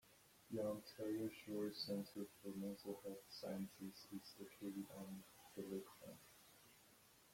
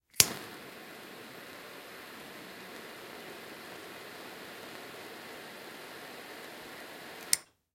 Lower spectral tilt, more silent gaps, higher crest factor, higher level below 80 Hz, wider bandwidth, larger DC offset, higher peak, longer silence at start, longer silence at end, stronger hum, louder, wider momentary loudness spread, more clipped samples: first, -5.5 dB/octave vs -0.5 dB/octave; neither; second, 16 dB vs 38 dB; second, -84 dBFS vs -70 dBFS; about the same, 16.5 kHz vs 16.5 kHz; neither; second, -36 dBFS vs -2 dBFS; about the same, 0.05 s vs 0.15 s; second, 0 s vs 0.25 s; neither; second, -51 LUFS vs -38 LUFS; first, 19 LU vs 15 LU; neither